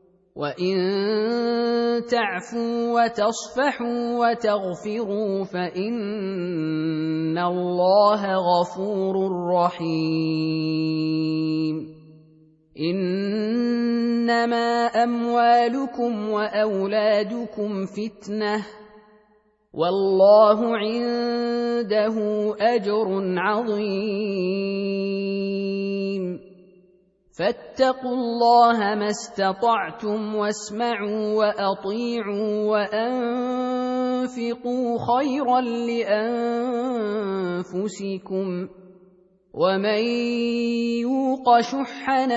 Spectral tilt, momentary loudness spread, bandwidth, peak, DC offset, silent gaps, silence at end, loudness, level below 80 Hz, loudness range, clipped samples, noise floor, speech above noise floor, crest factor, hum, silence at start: -6 dB/octave; 9 LU; 8 kHz; -4 dBFS; under 0.1%; none; 0 s; -23 LUFS; -66 dBFS; 5 LU; under 0.1%; -61 dBFS; 39 dB; 18 dB; none; 0.35 s